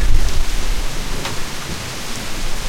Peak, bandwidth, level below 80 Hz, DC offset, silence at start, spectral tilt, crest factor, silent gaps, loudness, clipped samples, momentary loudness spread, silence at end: 0 dBFS; 15.5 kHz; -20 dBFS; under 0.1%; 0 s; -3 dB/octave; 14 dB; none; -24 LUFS; under 0.1%; 4 LU; 0 s